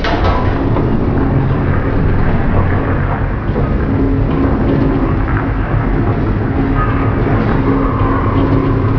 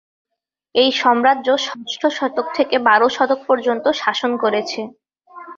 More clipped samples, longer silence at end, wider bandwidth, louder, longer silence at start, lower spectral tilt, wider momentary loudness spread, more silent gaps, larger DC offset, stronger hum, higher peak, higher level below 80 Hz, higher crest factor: neither; about the same, 0 s vs 0.05 s; second, 5.4 kHz vs 7.6 kHz; first, -14 LUFS vs -17 LUFS; second, 0 s vs 0.75 s; first, -10 dB/octave vs -3 dB/octave; second, 3 LU vs 8 LU; neither; first, 0.3% vs under 0.1%; neither; about the same, 0 dBFS vs -2 dBFS; first, -18 dBFS vs -66 dBFS; about the same, 12 dB vs 16 dB